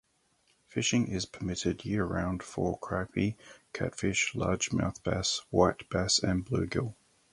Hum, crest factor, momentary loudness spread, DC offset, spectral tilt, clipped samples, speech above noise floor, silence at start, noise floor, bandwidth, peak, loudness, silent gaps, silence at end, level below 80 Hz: none; 22 dB; 8 LU; under 0.1%; -4 dB/octave; under 0.1%; 40 dB; 0.7 s; -71 dBFS; 11.5 kHz; -8 dBFS; -31 LUFS; none; 0.4 s; -50 dBFS